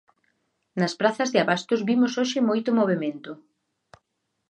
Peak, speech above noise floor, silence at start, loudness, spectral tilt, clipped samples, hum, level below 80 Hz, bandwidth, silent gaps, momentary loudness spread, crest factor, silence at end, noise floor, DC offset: -6 dBFS; 54 dB; 0.75 s; -23 LUFS; -5 dB/octave; under 0.1%; none; -76 dBFS; 9 kHz; none; 14 LU; 20 dB; 1.15 s; -77 dBFS; under 0.1%